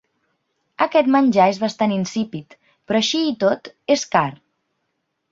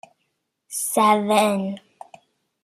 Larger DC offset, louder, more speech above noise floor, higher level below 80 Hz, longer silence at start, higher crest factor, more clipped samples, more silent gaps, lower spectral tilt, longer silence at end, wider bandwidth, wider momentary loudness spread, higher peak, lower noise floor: neither; about the same, -19 LUFS vs -20 LUFS; about the same, 55 dB vs 55 dB; first, -64 dBFS vs -70 dBFS; about the same, 0.8 s vs 0.7 s; about the same, 18 dB vs 20 dB; neither; neither; about the same, -4.5 dB/octave vs -4 dB/octave; about the same, 0.95 s vs 0.85 s; second, 7.8 kHz vs 14.5 kHz; second, 11 LU vs 14 LU; about the same, -2 dBFS vs -4 dBFS; about the same, -74 dBFS vs -74 dBFS